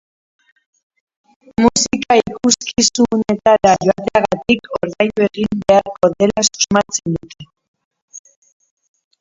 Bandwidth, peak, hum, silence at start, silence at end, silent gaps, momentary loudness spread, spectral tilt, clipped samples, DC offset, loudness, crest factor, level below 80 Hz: 7.8 kHz; 0 dBFS; none; 1.6 s; 1.05 s; 7.68-7.74 s, 7.85-7.91 s, 8.02-8.08 s; 6 LU; -3.5 dB/octave; under 0.1%; under 0.1%; -15 LUFS; 16 dB; -46 dBFS